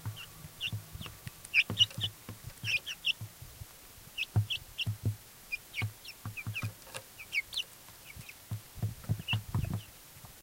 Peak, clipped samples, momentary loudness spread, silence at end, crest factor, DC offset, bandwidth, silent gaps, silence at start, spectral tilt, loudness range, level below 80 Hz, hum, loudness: -14 dBFS; under 0.1%; 19 LU; 0 s; 24 dB; under 0.1%; 16 kHz; none; 0 s; -3 dB/octave; 7 LU; -56 dBFS; none; -35 LUFS